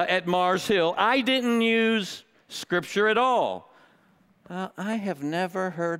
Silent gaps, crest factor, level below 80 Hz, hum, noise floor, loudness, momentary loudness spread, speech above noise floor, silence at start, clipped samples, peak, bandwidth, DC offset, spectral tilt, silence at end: none; 18 dB; -68 dBFS; none; -61 dBFS; -24 LUFS; 14 LU; 37 dB; 0 s; under 0.1%; -8 dBFS; 16 kHz; under 0.1%; -4.5 dB/octave; 0 s